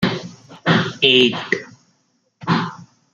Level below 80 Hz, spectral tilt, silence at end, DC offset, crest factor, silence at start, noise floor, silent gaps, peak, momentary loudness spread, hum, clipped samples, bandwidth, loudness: -58 dBFS; -5 dB/octave; 0.3 s; under 0.1%; 20 dB; 0 s; -65 dBFS; none; -2 dBFS; 17 LU; none; under 0.1%; 7.6 kHz; -17 LUFS